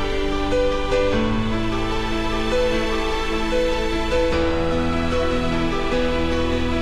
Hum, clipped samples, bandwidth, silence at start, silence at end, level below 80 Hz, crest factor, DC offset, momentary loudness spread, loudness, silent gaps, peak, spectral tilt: none; under 0.1%; 12 kHz; 0 s; 0 s; -26 dBFS; 12 dB; under 0.1%; 3 LU; -22 LUFS; none; -8 dBFS; -5.5 dB/octave